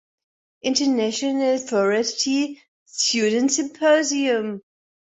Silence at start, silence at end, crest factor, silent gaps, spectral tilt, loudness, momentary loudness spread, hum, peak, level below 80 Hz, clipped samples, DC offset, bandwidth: 0.65 s; 0.45 s; 16 dB; 2.68-2.86 s; -2.5 dB/octave; -21 LUFS; 10 LU; none; -6 dBFS; -68 dBFS; under 0.1%; under 0.1%; 8.4 kHz